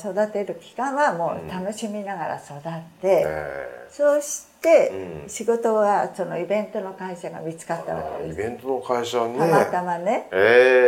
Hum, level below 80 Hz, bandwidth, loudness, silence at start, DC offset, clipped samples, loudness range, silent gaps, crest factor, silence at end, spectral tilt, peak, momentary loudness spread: none; -58 dBFS; 16.5 kHz; -23 LUFS; 0 s; under 0.1%; under 0.1%; 5 LU; none; 20 dB; 0 s; -4.5 dB/octave; -2 dBFS; 15 LU